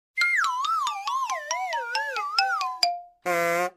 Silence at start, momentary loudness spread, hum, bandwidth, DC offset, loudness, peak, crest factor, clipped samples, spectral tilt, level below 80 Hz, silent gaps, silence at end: 0.15 s; 6 LU; none; 16 kHz; under 0.1%; -25 LUFS; -8 dBFS; 20 dB; under 0.1%; -1 dB/octave; -78 dBFS; none; 0.05 s